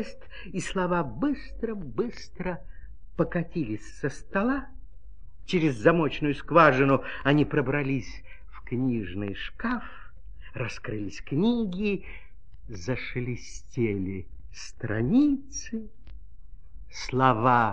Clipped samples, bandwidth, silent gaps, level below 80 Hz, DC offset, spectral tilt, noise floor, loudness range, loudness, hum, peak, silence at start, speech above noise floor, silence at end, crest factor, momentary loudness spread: under 0.1%; 10.5 kHz; none; -46 dBFS; 1%; -6.5 dB/octave; -47 dBFS; 9 LU; -27 LUFS; none; -4 dBFS; 0 s; 20 dB; 0 s; 24 dB; 19 LU